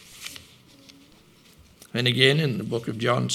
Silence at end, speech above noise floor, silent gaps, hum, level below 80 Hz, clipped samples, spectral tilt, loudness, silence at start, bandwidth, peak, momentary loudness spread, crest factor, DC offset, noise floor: 0 s; 32 dB; none; none; -64 dBFS; under 0.1%; -4.5 dB/octave; -23 LUFS; 0.1 s; 15.5 kHz; 0 dBFS; 20 LU; 26 dB; under 0.1%; -54 dBFS